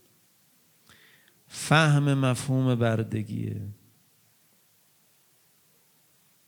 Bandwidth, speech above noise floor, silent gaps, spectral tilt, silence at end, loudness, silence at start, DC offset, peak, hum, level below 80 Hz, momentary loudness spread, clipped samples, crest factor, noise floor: 20 kHz; 39 dB; none; -6 dB/octave; 2.75 s; -25 LUFS; 1.5 s; under 0.1%; -6 dBFS; none; -68 dBFS; 17 LU; under 0.1%; 24 dB; -64 dBFS